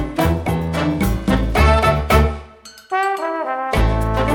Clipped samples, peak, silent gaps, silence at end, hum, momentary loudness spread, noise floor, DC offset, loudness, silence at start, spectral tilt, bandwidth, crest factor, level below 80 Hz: under 0.1%; 0 dBFS; none; 0 s; none; 7 LU; -41 dBFS; under 0.1%; -18 LUFS; 0 s; -6.5 dB/octave; 19 kHz; 16 dB; -22 dBFS